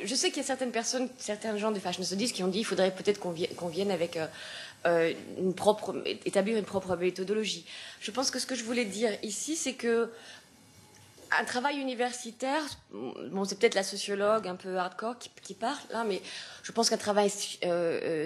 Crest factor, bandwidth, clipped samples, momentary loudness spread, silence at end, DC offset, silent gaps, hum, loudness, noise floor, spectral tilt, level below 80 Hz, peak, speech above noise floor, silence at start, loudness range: 22 dB; 13 kHz; under 0.1%; 10 LU; 0 s; under 0.1%; none; none; -31 LUFS; -57 dBFS; -3 dB/octave; -74 dBFS; -10 dBFS; 26 dB; 0 s; 2 LU